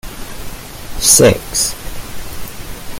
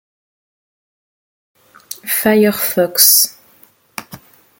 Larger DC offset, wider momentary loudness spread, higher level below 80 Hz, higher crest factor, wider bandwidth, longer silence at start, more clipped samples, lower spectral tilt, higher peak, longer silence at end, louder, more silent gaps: neither; about the same, 22 LU vs 24 LU; first, -30 dBFS vs -60 dBFS; about the same, 16 dB vs 18 dB; about the same, 17 kHz vs 17 kHz; second, 0.05 s vs 1.9 s; neither; about the same, -2.5 dB/octave vs -2 dB/octave; about the same, 0 dBFS vs 0 dBFS; second, 0 s vs 0.45 s; about the same, -11 LUFS vs -11 LUFS; neither